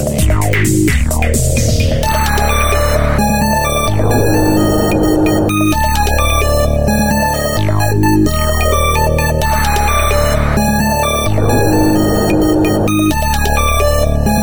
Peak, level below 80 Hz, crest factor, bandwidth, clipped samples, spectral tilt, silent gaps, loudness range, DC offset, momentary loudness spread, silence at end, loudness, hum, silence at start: 0 dBFS; -18 dBFS; 12 dB; over 20 kHz; under 0.1%; -5 dB/octave; none; 1 LU; 7%; 2 LU; 0 s; -13 LUFS; none; 0 s